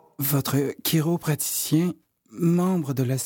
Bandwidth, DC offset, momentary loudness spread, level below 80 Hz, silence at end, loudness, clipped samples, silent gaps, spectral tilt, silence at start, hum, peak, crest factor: 17 kHz; under 0.1%; 4 LU; -66 dBFS; 0 s; -24 LUFS; under 0.1%; none; -5.5 dB/octave; 0.2 s; none; -8 dBFS; 16 dB